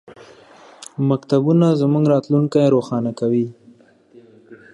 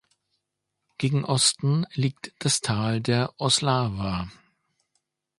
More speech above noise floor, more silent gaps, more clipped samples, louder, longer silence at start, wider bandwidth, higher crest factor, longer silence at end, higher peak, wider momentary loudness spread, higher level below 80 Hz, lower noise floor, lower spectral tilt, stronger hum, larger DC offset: second, 33 dB vs 57 dB; neither; neither; first, -18 LUFS vs -24 LUFS; second, 0.8 s vs 1 s; about the same, 11.5 kHz vs 11.5 kHz; about the same, 16 dB vs 20 dB; second, 0.2 s vs 1.05 s; first, -4 dBFS vs -8 dBFS; about the same, 9 LU vs 9 LU; second, -66 dBFS vs -52 dBFS; second, -50 dBFS vs -82 dBFS; first, -8.5 dB/octave vs -4 dB/octave; neither; neither